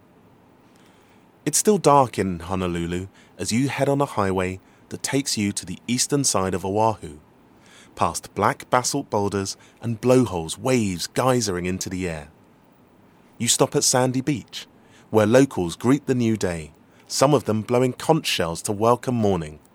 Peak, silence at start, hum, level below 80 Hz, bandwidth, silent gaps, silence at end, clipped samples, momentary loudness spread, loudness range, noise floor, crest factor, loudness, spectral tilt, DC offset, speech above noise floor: 0 dBFS; 1.45 s; none; -54 dBFS; 17 kHz; none; 0.15 s; under 0.1%; 12 LU; 4 LU; -54 dBFS; 22 dB; -22 LUFS; -4.5 dB/octave; under 0.1%; 32 dB